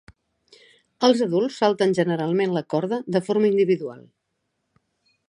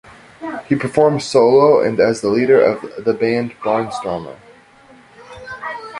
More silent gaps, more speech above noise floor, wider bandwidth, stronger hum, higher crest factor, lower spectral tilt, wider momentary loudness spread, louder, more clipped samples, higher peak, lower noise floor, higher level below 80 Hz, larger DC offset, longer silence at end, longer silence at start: neither; first, 55 dB vs 31 dB; about the same, 11 kHz vs 11.5 kHz; neither; about the same, 20 dB vs 16 dB; about the same, -6.5 dB/octave vs -6 dB/octave; second, 6 LU vs 17 LU; second, -22 LUFS vs -15 LUFS; neither; about the same, -4 dBFS vs -2 dBFS; first, -76 dBFS vs -46 dBFS; second, -68 dBFS vs -54 dBFS; neither; first, 1.3 s vs 0 s; first, 1 s vs 0.4 s